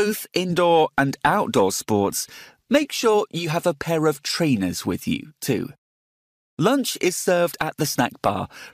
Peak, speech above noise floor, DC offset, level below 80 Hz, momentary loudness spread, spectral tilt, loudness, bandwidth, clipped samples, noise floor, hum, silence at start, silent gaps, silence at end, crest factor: -4 dBFS; over 68 dB; under 0.1%; -56 dBFS; 7 LU; -4.5 dB/octave; -22 LUFS; 15.5 kHz; under 0.1%; under -90 dBFS; none; 0 s; 5.78-6.57 s; 0.05 s; 18 dB